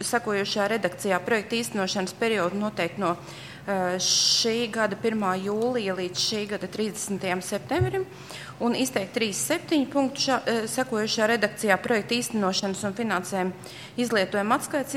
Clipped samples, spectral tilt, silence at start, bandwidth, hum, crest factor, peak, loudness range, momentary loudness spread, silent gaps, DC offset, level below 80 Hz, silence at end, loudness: under 0.1%; -3.5 dB/octave; 0 s; 16.5 kHz; none; 20 dB; -6 dBFS; 3 LU; 7 LU; none; under 0.1%; -60 dBFS; 0 s; -25 LUFS